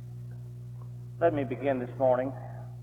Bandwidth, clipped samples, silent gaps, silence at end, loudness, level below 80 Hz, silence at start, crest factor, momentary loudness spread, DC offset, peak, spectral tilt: 7.2 kHz; under 0.1%; none; 0 s; -29 LUFS; -60 dBFS; 0 s; 18 dB; 16 LU; under 0.1%; -12 dBFS; -9 dB/octave